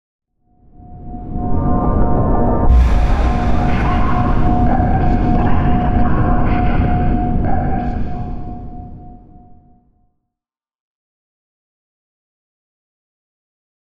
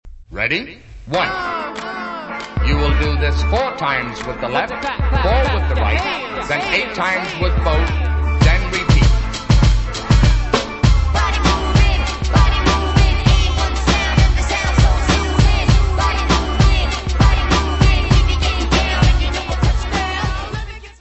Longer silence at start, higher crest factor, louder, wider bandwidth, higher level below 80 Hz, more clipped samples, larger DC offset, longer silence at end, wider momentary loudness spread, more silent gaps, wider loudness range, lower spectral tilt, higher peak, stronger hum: first, 0.2 s vs 0.05 s; about the same, 14 dB vs 16 dB; about the same, -17 LUFS vs -17 LUFS; second, 6.2 kHz vs 8.4 kHz; about the same, -20 dBFS vs -18 dBFS; neither; first, 2% vs under 0.1%; first, 3.05 s vs 0.1 s; first, 15 LU vs 7 LU; first, 10.80-10.95 s vs none; first, 11 LU vs 4 LU; first, -9.5 dB/octave vs -5 dB/octave; about the same, -2 dBFS vs 0 dBFS; neither